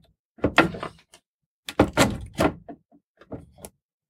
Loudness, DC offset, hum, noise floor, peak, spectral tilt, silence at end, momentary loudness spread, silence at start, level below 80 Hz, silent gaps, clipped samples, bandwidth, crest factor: -23 LUFS; under 0.1%; none; -73 dBFS; -2 dBFS; -4.5 dB/octave; 0.45 s; 25 LU; 0.4 s; -44 dBFS; 1.26-1.39 s, 1.46-1.63 s, 3.04-3.14 s; under 0.1%; 17 kHz; 26 dB